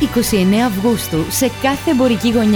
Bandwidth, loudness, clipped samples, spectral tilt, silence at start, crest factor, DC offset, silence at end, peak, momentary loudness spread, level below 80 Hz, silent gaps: over 20 kHz; -15 LUFS; under 0.1%; -5 dB/octave; 0 s; 12 dB; under 0.1%; 0 s; -2 dBFS; 4 LU; -36 dBFS; none